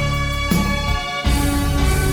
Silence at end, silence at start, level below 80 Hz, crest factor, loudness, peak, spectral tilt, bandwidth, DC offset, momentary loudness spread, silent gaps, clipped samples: 0 s; 0 s; -22 dBFS; 12 dB; -19 LUFS; -6 dBFS; -5 dB/octave; over 20 kHz; under 0.1%; 2 LU; none; under 0.1%